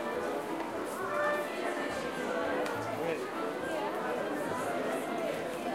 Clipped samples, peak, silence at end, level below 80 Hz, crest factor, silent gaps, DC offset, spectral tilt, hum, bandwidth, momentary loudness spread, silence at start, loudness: under 0.1%; -20 dBFS; 0 s; -68 dBFS; 14 dB; none; under 0.1%; -4.5 dB/octave; none; 16 kHz; 4 LU; 0 s; -34 LUFS